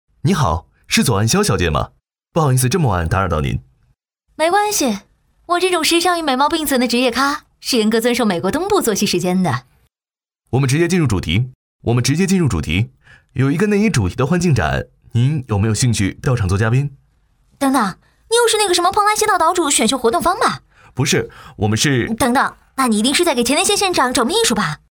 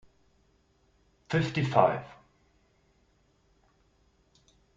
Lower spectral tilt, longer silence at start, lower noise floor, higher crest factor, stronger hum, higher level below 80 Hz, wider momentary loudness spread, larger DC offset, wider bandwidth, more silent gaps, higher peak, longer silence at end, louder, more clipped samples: second, -4.5 dB/octave vs -7 dB/octave; second, 0.25 s vs 1.3 s; first, under -90 dBFS vs -68 dBFS; second, 16 dB vs 28 dB; neither; first, -38 dBFS vs -64 dBFS; second, 7 LU vs 14 LU; neither; first, over 20 kHz vs 7.8 kHz; first, 11.55-11.79 s vs none; first, 0 dBFS vs -6 dBFS; second, 0.2 s vs 2.65 s; first, -16 LUFS vs -28 LUFS; neither